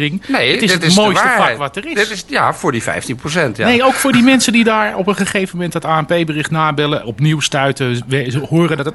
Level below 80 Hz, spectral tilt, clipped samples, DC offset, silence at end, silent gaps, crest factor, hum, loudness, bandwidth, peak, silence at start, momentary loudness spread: -48 dBFS; -4.5 dB/octave; under 0.1%; under 0.1%; 0 s; none; 14 dB; none; -14 LUFS; 12 kHz; 0 dBFS; 0 s; 8 LU